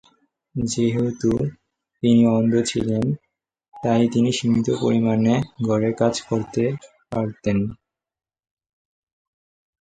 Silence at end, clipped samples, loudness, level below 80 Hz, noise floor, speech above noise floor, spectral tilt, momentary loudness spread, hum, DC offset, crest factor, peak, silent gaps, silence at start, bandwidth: 2.05 s; under 0.1%; -21 LUFS; -52 dBFS; -61 dBFS; 41 dB; -6.5 dB/octave; 10 LU; none; under 0.1%; 18 dB; -4 dBFS; none; 0.55 s; 9.2 kHz